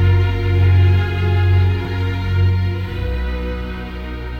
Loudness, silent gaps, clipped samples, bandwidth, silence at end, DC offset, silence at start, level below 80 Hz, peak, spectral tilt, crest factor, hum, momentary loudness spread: -17 LUFS; none; under 0.1%; 5.2 kHz; 0 s; under 0.1%; 0 s; -26 dBFS; -4 dBFS; -8.5 dB/octave; 12 dB; none; 13 LU